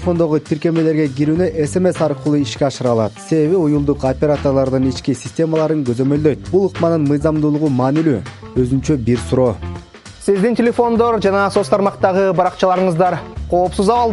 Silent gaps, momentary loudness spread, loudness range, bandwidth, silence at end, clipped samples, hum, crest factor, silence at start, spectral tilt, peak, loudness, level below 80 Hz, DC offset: none; 4 LU; 2 LU; 11.5 kHz; 0 s; under 0.1%; none; 14 dB; 0 s; -7 dB/octave; 0 dBFS; -16 LUFS; -38 dBFS; under 0.1%